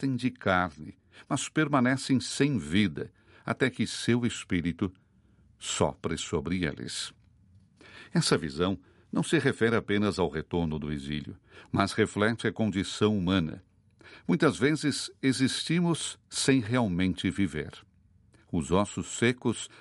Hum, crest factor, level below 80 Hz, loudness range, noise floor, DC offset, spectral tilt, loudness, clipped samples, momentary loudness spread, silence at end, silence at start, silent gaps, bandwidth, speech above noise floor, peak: none; 22 dB; -54 dBFS; 4 LU; -62 dBFS; under 0.1%; -5 dB/octave; -29 LUFS; under 0.1%; 10 LU; 0.15 s; 0 s; none; 11.5 kHz; 33 dB; -8 dBFS